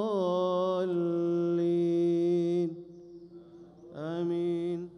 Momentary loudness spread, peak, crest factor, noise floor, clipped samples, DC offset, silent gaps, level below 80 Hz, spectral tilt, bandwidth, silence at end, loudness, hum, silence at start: 20 LU; -20 dBFS; 10 dB; -51 dBFS; under 0.1%; under 0.1%; none; -74 dBFS; -8.5 dB/octave; 6.4 kHz; 0 s; -29 LUFS; none; 0 s